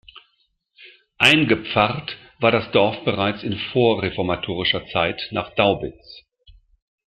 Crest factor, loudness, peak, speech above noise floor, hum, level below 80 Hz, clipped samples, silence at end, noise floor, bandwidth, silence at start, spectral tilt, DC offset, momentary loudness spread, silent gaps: 22 dB; -20 LUFS; 0 dBFS; 47 dB; none; -52 dBFS; under 0.1%; 0.9 s; -68 dBFS; 15.5 kHz; 0.8 s; -5.5 dB/octave; under 0.1%; 11 LU; none